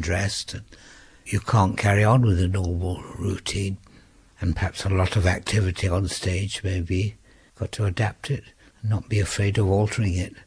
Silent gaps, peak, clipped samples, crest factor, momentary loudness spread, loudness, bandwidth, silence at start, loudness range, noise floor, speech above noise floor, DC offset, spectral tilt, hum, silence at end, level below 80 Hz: none; -6 dBFS; under 0.1%; 16 dB; 11 LU; -24 LUFS; 11 kHz; 0 s; 4 LU; -53 dBFS; 30 dB; under 0.1%; -5.5 dB/octave; none; 0.05 s; -40 dBFS